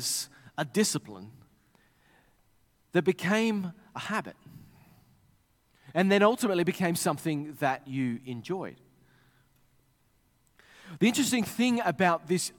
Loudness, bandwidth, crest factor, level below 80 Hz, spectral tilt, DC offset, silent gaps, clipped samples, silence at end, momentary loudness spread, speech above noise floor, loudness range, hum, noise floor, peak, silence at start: -28 LUFS; 17.5 kHz; 22 dB; -72 dBFS; -4.5 dB/octave; under 0.1%; none; under 0.1%; 0.1 s; 14 LU; 40 dB; 7 LU; none; -68 dBFS; -8 dBFS; 0 s